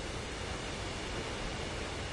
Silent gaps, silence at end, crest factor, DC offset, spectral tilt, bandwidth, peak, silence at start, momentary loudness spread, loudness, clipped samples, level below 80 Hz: none; 0 s; 12 dB; under 0.1%; -4 dB/octave; 11.5 kHz; -26 dBFS; 0 s; 1 LU; -39 LUFS; under 0.1%; -46 dBFS